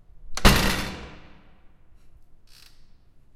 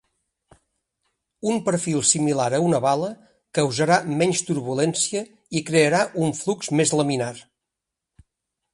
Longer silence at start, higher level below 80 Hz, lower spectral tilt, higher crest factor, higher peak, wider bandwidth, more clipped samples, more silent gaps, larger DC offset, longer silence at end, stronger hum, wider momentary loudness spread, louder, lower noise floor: second, 0.15 s vs 1.45 s; first, -30 dBFS vs -64 dBFS; about the same, -4 dB/octave vs -4 dB/octave; first, 26 dB vs 20 dB; first, 0 dBFS vs -4 dBFS; first, 16 kHz vs 11.5 kHz; neither; neither; neither; about the same, 1.25 s vs 1.35 s; neither; first, 22 LU vs 10 LU; about the same, -22 LUFS vs -22 LUFS; second, -51 dBFS vs -84 dBFS